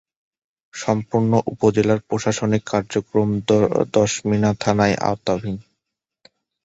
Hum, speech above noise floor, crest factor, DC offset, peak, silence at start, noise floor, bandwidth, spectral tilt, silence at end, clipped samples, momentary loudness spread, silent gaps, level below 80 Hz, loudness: none; 62 dB; 18 dB; under 0.1%; -2 dBFS; 0.75 s; -81 dBFS; 8 kHz; -6 dB/octave; 1.05 s; under 0.1%; 6 LU; none; -50 dBFS; -20 LUFS